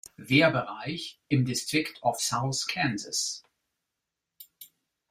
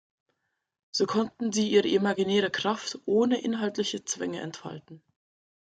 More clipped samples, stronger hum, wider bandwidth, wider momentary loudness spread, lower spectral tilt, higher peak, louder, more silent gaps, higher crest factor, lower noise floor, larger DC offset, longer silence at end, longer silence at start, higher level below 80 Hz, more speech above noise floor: neither; neither; first, 16 kHz vs 9.2 kHz; about the same, 14 LU vs 12 LU; about the same, -4 dB/octave vs -4 dB/octave; about the same, -8 dBFS vs -10 dBFS; about the same, -27 LUFS vs -27 LUFS; neither; about the same, 22 dB vs 18 dB; first, -86 dBFS vs -79 dBFS; neither; second, 0.45 s vs 0.8 s; second, 0.2 s vs 0.95 s; first, -66 dBFS vs -72 dBFS; first, 58 dB vs 52 dB